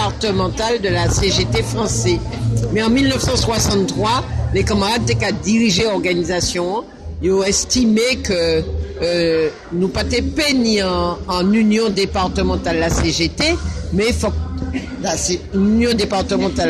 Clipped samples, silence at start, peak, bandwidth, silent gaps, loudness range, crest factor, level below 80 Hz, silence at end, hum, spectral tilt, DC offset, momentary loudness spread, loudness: under 0.1%; 0 s; -4 dBFS; 13 kHz; none; 2 LU; 14 dB; -30 dBFS; 0 s; none; -4.5 dB/octave; under 0.1%; 7 LU; -17 LUFS